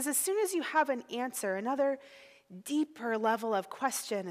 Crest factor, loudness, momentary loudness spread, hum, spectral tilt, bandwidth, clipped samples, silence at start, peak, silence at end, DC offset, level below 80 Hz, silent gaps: 18 dB; -32 LUFS; 6 LU; none; -2.5 dB/octave; 16 kHz; under 0.1%; 0 s; -14 dBFS; 0 s; under 0.1%; -88 dBFS; none